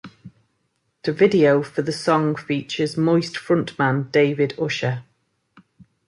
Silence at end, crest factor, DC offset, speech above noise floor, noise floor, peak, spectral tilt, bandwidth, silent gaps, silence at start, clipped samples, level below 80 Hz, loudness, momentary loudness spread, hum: 0.25 s; 18 dB; under 0.1%; 51 dB; -71 dBFS; -4 dBFS; -6.5 dB/octave; 11.5 kHz; none; 0.05 s; under 0.1%; -64 dBFS; -20 LUFS; 9 LU; none